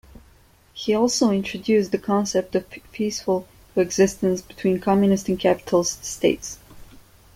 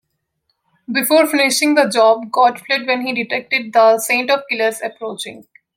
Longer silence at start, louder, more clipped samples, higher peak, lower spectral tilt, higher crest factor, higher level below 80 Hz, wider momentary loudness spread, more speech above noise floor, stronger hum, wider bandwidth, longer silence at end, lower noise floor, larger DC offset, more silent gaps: second, 0.75 s vs 0.9 s; second, -22 LUFS vs -15 LUFS; neither; second, -4 dBFS vs 0 dBFS; first, -5 dB/octave vs -2 dB/octave; about the same, 18 dB vs 16 dB; first, -52 dBFS vs -72 dBFS; second, 9 LU vs 13 LU; second, 33 dB vs 54 dB; neither; about the same, 16 kHz vs 16.5 kHz; first, 0.5 s vs 0.35 s; second, -54 dBFS vs -70 dBFS; neither; neither